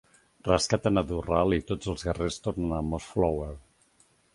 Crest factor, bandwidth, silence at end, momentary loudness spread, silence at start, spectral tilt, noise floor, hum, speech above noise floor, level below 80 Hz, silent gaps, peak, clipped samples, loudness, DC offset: 22 dB; 11.5 kHz; 0.75 s; 9 LU; 0.45 s; -5.5 dB/octave; -65 dBFS; none; 37 dB; -42 dBFS; none; -8 dBFS; under 0.1%; -28 LUFS; under 0.1%